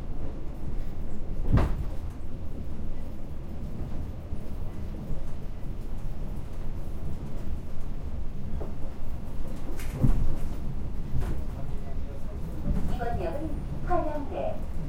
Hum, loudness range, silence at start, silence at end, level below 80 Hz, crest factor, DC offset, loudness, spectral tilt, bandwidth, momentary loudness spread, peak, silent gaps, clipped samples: none; 5 LU; 0 s; 0 s; -32 dBFS; 18 dB; under 0.1%; -35 LUFS; -8 dB/octave; 4.5 kHz; 10 LU; -8 dBFS; none; under 0.1%